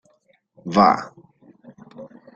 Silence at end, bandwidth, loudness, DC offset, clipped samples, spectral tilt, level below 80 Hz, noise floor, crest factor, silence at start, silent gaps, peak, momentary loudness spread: 0.3 s; 7.6 kHz; -18 LUFS; under 0.1%; under 0.1%; -6.5 dB/octave; -62 dBFS; -62 dBFS; 22 dB; 0.65 s; none; -2 dBFS; 26 LU